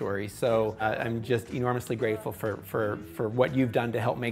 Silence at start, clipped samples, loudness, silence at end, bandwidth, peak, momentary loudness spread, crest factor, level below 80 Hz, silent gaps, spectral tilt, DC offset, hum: 0 s; under 0.1%; -29 LUFS; 0 s; 16 kHz; -10 dBFS; 6 LU; 18 dB; -58 dBFS; none; -6.5 dB/octave; under 0.1%; none